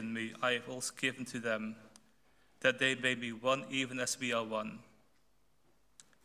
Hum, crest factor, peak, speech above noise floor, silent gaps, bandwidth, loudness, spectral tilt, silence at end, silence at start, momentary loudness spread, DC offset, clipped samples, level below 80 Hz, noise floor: none; 24 dB; -14 dBFS; 39 dB; none; 16 kHz; -35 LUFS; -3 dB/octave; 1.4 s; 0 s; 9 LU; under 0.1%; under 0.1%; -76 dBFS; -75 dBFS